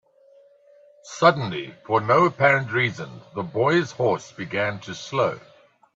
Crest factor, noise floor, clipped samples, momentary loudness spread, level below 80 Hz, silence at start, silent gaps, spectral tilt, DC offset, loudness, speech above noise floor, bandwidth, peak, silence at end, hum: 22 dB; -55 dBFS; under 0.1%; 15 LU; -64 dBFS; 1.05 s; none; -5.5 dB/octave; under 0.1%; -22 LUFS; 32 dB; 7.8 kHz; -2 dBFS; 0.55 s; none